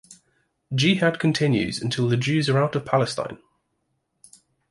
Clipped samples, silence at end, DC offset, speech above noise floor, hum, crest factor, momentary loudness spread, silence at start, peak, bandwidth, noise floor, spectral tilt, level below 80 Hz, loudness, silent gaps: under 0.1%; 1.35 s; under 0.1%; 52 dB; none; 18 dB; 7 LU; 0.1 s; -6 dBFS; 11.5 kHz; -74 dBFS; -5.5 dB/octave; -58 dBFS; -22 LUFS; none